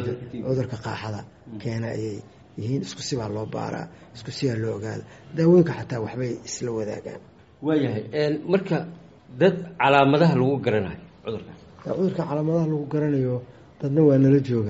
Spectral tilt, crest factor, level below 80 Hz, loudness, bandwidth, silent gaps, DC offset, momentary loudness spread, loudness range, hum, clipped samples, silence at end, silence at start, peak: -6.5 dB/octave; 22 dB; -58 dBFS; -24 LUFS; 8 kHz; none; under 0.1%; 18 LU; 8 LU; none; under 0.1%; 0 s; 0 s; -2 dBFS